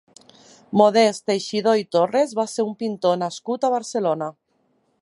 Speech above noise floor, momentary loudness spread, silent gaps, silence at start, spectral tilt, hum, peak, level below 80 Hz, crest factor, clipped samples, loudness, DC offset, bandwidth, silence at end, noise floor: 46 dB; 8 LU; none; 0.7 s; -5 dB/octave; none; -2 dBFS; -74 dBFS; 20 dB; under 0.1%; -21 LUFS; under 0.1%; 11.5 kHz; 0.7 s; -66 dBFS